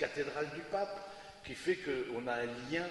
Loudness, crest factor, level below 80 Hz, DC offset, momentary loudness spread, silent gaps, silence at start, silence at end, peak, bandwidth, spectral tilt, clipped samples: -38 LUFS; 20 dB; -68 dBFS; under 0.1%; 10 LU; none; 0 s; 0 s; -18 dBFS; 11.5 kHz; -5 dB/octave; under 0.1%